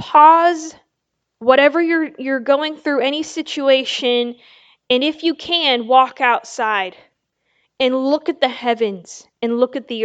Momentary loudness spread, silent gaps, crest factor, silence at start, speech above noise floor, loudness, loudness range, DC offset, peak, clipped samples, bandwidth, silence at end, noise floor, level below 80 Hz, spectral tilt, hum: 11 LU; none; 18 dB; 0 s; 59 dB; -17 LUFS; 4 LU; under 0.1%; 0 dBFS; under 0.1%; 8.8 kHz; 0 s; -76 dBFS; -68 dBFS; -3 dB/octave; none